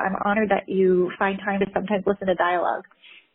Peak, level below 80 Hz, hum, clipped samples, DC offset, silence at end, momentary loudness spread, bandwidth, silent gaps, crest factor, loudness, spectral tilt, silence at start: -8 dBFS; -56 dBFS; none; under 0.1%; under 0.1%; 0.5 s; 4 LU; 4 kHz; none; 14 dB; -23 LUFS; -5 dB/octave; 0 s